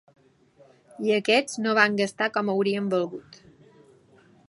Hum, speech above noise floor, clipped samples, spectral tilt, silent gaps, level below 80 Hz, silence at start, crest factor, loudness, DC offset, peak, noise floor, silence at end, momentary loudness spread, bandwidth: none; 34 dB; under 0.1%; -4.5 dB/octave; none; -74 dBFS; 1 s; 22 dB; -24 LUFS; under 0.1%; -4 dBFS; -58 dBFS; 1.15 s; 9 LU; 11.5 kHz